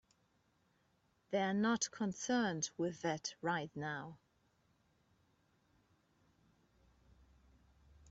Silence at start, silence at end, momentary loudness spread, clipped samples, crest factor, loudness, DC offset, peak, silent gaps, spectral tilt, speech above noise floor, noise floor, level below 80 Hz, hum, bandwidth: 1.3 s; 3.95 s; 9 LU; under 0.1%; 20 dB; -39 LUFS; under 0.1%; -22 dBFS; none; -4 dB/octave; 39 dB; -77 dBFS; -76 dBFS; none; 8 kHz